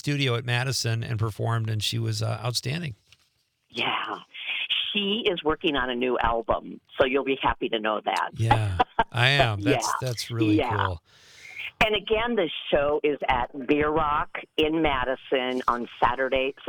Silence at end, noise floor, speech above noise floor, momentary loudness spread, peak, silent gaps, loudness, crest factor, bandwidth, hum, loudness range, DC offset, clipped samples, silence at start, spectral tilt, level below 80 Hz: 0 s; -69 dBFS; 44 dB; 7 LU; -4 dBFS; none; -25 LUFS; 22 dB; 19 kHz; none; 5 LU; under 0.1%; under 0.1%; 0.05 s; -5 dB/octave; -46 dBFS